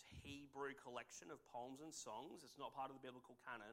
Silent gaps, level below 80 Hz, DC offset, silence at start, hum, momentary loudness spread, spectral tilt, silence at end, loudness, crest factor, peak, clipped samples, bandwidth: none; -78 dBFS; under 0.1%; 0 s; none; 7 LU; -3.5 dB/octave; 0 s; -55 LUFS; 18 dB; -38 dBFS; under 0.1%; 16 kHz